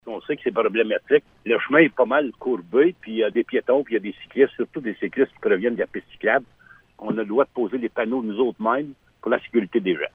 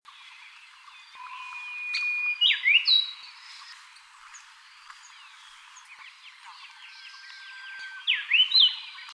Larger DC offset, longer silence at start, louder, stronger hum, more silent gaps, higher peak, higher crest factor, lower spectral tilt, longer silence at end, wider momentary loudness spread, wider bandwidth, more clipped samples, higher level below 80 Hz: neither; second, 0.05 s vs 0.2 s; about the same, -22 LUFS vs -22 LUFS; neither; neither; first, -2 dBFS vs -10 dBFS; about the same, 20 dB vs 20 dB; first, -8.5 dB/octave vs 7.5 dB/octave; about the same, 0.05 s vs 0 s; second, 9 LU vs 27 LU; second, 3.8 kHz vs 11 kHz; neither; first, -64 dBFS vs -86 dBFS